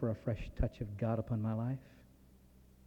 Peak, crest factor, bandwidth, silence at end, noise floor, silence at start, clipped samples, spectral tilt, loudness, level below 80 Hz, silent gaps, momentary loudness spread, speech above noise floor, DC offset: -22 dBFS; 18 dB; 7 kHz; 0.8 s; -62 dBFS; 0 s; under 0.1%; -9.5 dB/octave; -39 LUFS; -48 dBFS; none; 5 LU; 25 dB; under 0.1%